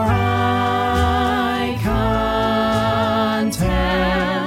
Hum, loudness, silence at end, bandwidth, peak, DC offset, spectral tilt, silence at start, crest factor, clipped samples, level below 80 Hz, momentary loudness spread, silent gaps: none; -18 LUFS; 0 s; 16.5 kHz; -4 dBFS; under 0.1%; -6 dB/octave; 0 s; 14 dB; under 0.1%; -30 dBFS; 2 LU; none